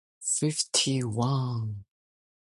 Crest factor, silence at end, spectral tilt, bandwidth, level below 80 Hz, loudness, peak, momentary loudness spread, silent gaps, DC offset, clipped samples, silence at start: 18 dB; 0.7 s; -4 dB/octave; 11.5 kHz; -62 dBFS; -27 LUFS; -12 dBFS; 10 LU; none; under 0.1%; under 0.1%; 0.2 s